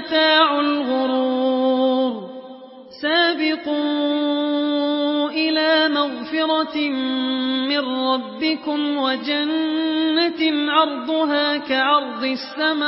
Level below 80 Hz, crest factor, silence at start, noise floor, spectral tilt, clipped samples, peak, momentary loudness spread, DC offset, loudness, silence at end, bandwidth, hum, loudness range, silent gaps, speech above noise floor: -68 dBFS; 16 dB; 0 s; -40 dBFS; -7.5 dB/octave; under 0.1%; -4 dBFS; 6 LU; under 0.1%; -19 LUFS; 0 s; 5.8 kHz; none; 2 LU; none; 20 dB